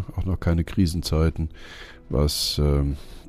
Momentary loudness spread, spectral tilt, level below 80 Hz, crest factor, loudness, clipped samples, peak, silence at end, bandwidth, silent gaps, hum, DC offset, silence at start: 13 LU; -5.5 dB/octave; -30 dBFS; 14 dB; -24 LUFS; under 0.1%; -8 dBFS; 0 s; 15.5 kHz; none; none; under 0.1%; 0 s